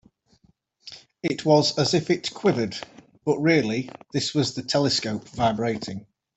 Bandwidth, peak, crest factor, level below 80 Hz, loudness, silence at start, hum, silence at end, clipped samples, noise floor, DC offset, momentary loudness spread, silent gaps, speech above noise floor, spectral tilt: 8.4 kHz; -6 dBFS; 20 dB; -60 dBFS; -24 LUFS; 0.85 s; none; 0.35 s; under 0.1%; -63 dBFS; under 0.1%; 16 LU; none; 40 dB; -5 dB/octave